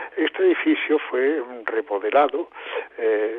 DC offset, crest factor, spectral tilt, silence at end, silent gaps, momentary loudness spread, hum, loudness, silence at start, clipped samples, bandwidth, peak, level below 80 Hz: under 0.1%; 16 dB; -6 dB/octave; 0 s; none; 10 LU; none; -22 LUFS; 0 s; under 0.1%; 4.1 kHz; -6 dBFS; -74 dBFS